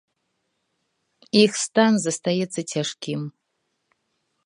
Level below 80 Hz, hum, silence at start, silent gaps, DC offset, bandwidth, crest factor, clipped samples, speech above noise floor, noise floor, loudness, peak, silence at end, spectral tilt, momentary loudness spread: -72 dBFS; none; 1.35 s; none; under 0.1%; 11 kHz; 22 dB; under 0.1%; 54 dB; -75 dBFS; -22 LUFS; -4 dBFS; 1.15 s; -4 dB/octave; 12 LU